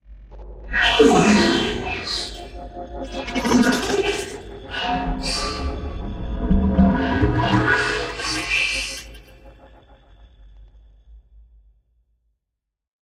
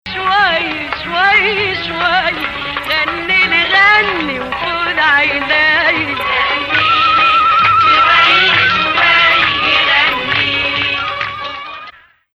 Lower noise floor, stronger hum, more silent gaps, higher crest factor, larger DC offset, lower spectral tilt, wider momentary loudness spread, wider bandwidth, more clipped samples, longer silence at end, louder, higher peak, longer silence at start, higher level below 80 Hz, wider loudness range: first, -82 dBFS vs -38 dBFS; neither; neither; first, 20 dB vs 12 dB; neither; about the same, -4.5 dB/octave vs -3.5 dB/octave; first, 18 LU vs 11 LU; about the same, 15.5 kHz vs 15.5 kHz; neither; first, 1.85 s vs 0.45 s; second, -20 LUFS vs -11 LUFS; about the same, -2 dBFS vs 0 dBFS; about the same, 0.1 s vs 0.05 s; first, -32 dBFS vs -42 dBFS; first, 7 LU vs 4 LU